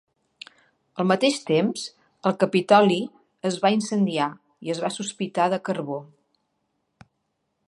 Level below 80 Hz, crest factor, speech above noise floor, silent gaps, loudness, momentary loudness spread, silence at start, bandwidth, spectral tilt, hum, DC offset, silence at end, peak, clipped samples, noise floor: -74 dBFS; 22 dB; 53 dB; none; -23 LUFS; 19 LU; 0.95 s; 11.5 kHz; -5 dB/octave; none; under 0.1%; 1.65 s; -2 dBFS; under 0.1%; -76 dBFS